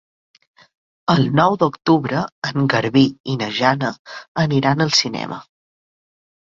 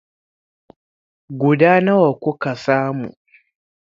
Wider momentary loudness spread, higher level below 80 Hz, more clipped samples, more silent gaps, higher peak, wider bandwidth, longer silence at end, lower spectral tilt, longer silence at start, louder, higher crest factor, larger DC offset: second, 12 LU vs 15 LU; first, -56 dBFS vs -64 dBFS; neither; first, 2.32-2.42 s, 3.20-3.24 s, 3.99-4.05 s, 4.28-4.35 s vs none; about the same, 0 dBFS vs 0 dBFS; about the same, 7.6 kHz vs 7.6 kHz; first, 1.05 s vs 0.85 s; second, -5.5 dB/octave vs -8 dB/octave; second, 1.1 s vs 1.3 s; about the same, -18 LUFS vs -17 LUFS; about the same, 18 dB vs 20 dB; neither